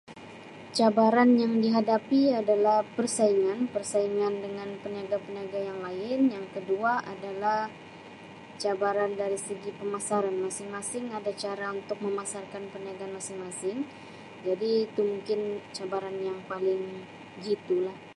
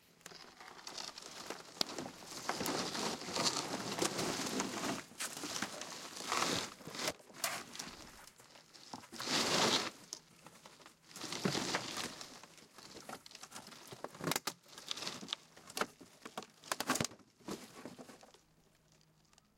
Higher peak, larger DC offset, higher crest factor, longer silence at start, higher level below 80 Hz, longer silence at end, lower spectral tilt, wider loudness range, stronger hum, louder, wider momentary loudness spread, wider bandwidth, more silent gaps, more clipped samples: first, -10 dBFS vs -14 dBFS; neither; second, 20 dB vs 28 dB; second, 0.1 s vs 0.25 s; about the same, -74 dBFS vs -76 dBFS; second, 0.05 s vs 1.25 s; first, -4.5 dB/octave vs -2 dB/octave; first, 9 LU vs 6 LU; neither; first, -29 LUFS vs -39 LUFS; second, 15 LU vs 20 LU; second, 11.5 kHz vs 16.5 kHz; neither; neither